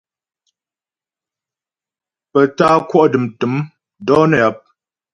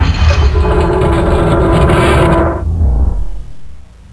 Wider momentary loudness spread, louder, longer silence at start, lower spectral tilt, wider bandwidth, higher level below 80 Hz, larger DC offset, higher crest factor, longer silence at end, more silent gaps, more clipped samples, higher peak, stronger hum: about the same, 10 LU vs 8 LU; second, -15 LUFS vs -11 LUFS; first, 2.35 s vs 0 s; about the same, -7 dB/octave vs -7 dB/octave; about the same, 11 kHz vs 11 kHz; second, -56 dBFS vs -14 dBFS; neither; first, 18 dB vs 10 dB; first, 0.55 s vs 0.3 s; neither; neither; about the same, 0 dBFS vs 0 dBFS; neither